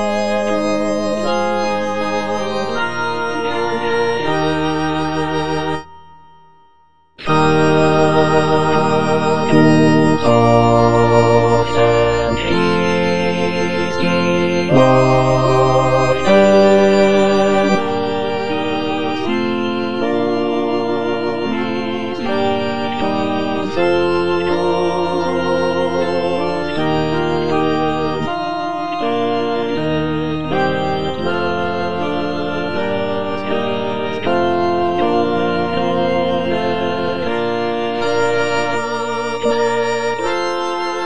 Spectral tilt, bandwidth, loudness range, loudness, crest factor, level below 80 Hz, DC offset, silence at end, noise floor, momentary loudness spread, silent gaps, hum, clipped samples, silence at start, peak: -6 dB/octave; 10 kHz; 6 LU; -16 LUFS; 16 dB; -42 dBFS; 4%; 0 s; -54 dBFS; 8 LU; none; none; under 0.1%; 0 s; 0 dBFS